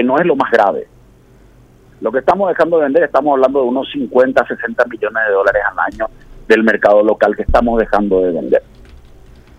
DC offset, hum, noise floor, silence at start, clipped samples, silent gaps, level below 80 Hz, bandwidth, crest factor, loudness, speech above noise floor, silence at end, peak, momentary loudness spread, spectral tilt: under 0.1%; none; -44 dBFS; 0 s; under 0.1%; none; -34 dBFS; 9 kHz; 14 dB; -14 LUFS; 32 dB; 1 s; 0 dBFS; 8 LU; -7 dB/octave